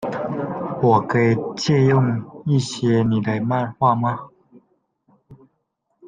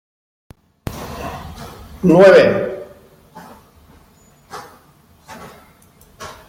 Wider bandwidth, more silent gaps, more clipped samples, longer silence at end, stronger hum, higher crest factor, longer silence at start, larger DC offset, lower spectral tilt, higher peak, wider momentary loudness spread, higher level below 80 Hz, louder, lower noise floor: second, 9.4 kHz vs 16.5 kHz; neither; neither; second, 0 s vs 0.15 s; neither; about the same, 18 dB vs 18 dB; second, 0 s vs 0.85 s; neither; about the same, -7 dB/octave vs -6.5 dB/octave; about the same, -2 dBFS vs -2 dBFS; second, 9 LU vs 28 LU; second, -56 dBFS vs -46 dBFS; second, -20 LUFS vs -12 LUFS; first, -72 dBFS vs -50 dBFS